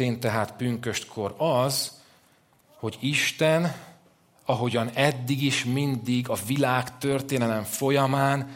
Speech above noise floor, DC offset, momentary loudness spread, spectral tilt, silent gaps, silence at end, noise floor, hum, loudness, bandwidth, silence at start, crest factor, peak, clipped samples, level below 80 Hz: 36 dB; under 0.1%; 8 LU; -5 dB/octave; none; 0 s; -61 dBFS; none; -26 LUFS; 16.5 kHz; 0 s; 22 dB; -4 dBFS; under 0.1%; -66 dBFS